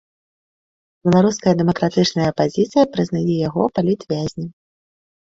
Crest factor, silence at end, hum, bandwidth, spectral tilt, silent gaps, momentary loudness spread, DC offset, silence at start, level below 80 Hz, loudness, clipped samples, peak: 16 dB; 0.8 s; none; 7.8 kHz; -6.5 dB/octave; none; 9 LU; under 0.1%; 1.05 s; -52 dBFS; -18 LUFS; under 0.1%; -2 dBFS